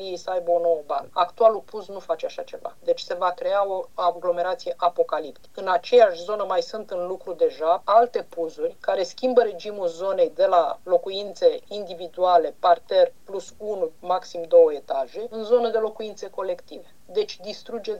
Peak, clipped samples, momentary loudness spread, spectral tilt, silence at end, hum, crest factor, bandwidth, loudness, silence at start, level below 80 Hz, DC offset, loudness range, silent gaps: -4 dBFS; under 0.1%; 13 LU; -4 dB/octave; 0 s; none; 20 dB; 8.4 kHz; -23 LUFS; 0 s; -70 dBFS; 0.5%; 3 LU; none